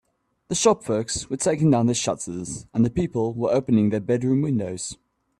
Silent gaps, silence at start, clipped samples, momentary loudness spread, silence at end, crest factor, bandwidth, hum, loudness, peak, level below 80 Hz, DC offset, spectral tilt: none; 0.5 s; under 0.1%; 10 LU; 0.45 s; 18 dB; 12.5 kHz; none; -23 LUFS; -4 dBFS; -52 dBFS; under 0.1%; -5.5 dB/octave